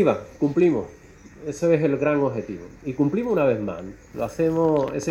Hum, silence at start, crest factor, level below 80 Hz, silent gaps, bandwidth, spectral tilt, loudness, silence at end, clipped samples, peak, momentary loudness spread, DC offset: none; 0 s; 18 dB; -52 dBFS; none; 16 kHz; -7.5 dB/octave; -23 LUFS; 0 s; under 0.1%; -6 dBFS; 15 LU; under 0.1%